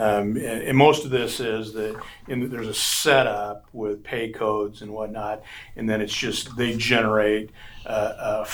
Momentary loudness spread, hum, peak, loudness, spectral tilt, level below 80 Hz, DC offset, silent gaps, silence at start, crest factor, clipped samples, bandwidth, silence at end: 14 LU; none; -2 dBFS; -23 LUFS; -4 dB/octave; -50 dBFS; under 0.1%; none; 0 s; 22 dB; under 0.1%; over 20 kHz; 0 s